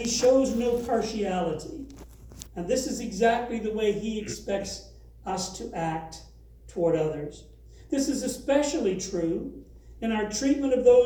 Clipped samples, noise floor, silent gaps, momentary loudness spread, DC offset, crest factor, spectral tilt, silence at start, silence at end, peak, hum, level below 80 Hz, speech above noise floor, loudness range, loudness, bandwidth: under 0.1%; -46 dBFS; none; 17 LU; under 0.1%; 20 dB; -4.5 dB/octave; 0 s; 0 s; -8 dBFS; none; -48 dBFS; 20 dB; 4 LU; -27 LUFS; over 20 kHz